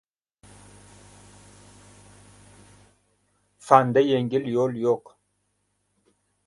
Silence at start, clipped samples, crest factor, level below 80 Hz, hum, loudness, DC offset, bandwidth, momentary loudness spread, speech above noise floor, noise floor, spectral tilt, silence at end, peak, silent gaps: 3.65 s; under 0.1%; 26 dB; -64 dBFS; 50 Hz at -60 dBFS; -22 LUFS; under 0.1%; 11.5 kHz; 9 LU; 52 dB; -73 dBFS; -6.5 dB/octave; 1.45 s; 0 dBFS; none